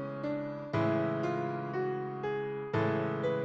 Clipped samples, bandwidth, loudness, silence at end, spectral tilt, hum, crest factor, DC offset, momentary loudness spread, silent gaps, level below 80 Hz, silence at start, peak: under 0.1%; 7.6 kHz; -34 LUFS; 0 s; -8.5 dB/octave; none; 16 dB; under 0.1%; 5 LU; none; -66 dBFS; 0 s; -18 dBFS